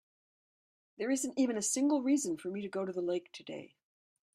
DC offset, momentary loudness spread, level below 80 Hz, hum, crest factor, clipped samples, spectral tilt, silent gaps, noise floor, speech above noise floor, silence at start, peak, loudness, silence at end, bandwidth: under 0.1%; 15 LU; -82 dBFS; none; 16 dB; under 0.1%; -3.5 dB/octave; none; under -90 dBFS; over 56 dB; 1 s; -20 dBFS; -33 LUFS; 0.7 s; 15 kHz